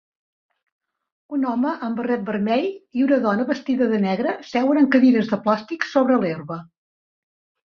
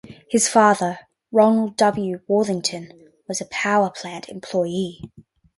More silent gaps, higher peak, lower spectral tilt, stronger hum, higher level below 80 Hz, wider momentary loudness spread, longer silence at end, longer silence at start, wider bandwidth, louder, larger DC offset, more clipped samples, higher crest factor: neither; about the same, -4 dBFS vs -2 dBFS; first, -7 dB/octave vs -4 dB/octave; neither; about the same, -66 dBFS vs -62 dBFS; second, 10 LU vs 17 LU; first, 1.1 s vs 0.5 s; first, 1.3 s vs 0.05 s; second, 6.6 kHz vs 11.5 kHz; about the same, -21 LUFS vs -20 LUFS; neither; neither; about the same, 18 dB vs 18 dB